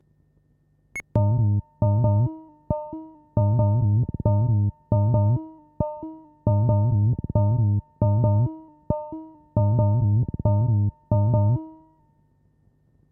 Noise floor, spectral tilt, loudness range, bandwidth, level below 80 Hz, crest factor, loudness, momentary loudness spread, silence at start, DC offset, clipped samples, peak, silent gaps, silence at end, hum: -63 dBFS; -12 dB/octave; 1 LU; 2.3 kHz; -42 dBFS; 14 dB; -23 LUFS; 16 LU; 0.95 s; under 0.1%; under 0.1%; -8 dBFS; none; 1.4 s; none